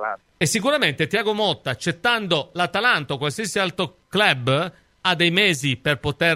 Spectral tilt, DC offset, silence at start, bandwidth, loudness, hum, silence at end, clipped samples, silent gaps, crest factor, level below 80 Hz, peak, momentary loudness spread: -3.5 dB/octave; under 0.1%; 0 s; 16 kHz; -21 LUFS; none; 0 s; under 0.1%; none; 20 dB; -56 dBFS; -2 dBFS; 7 LU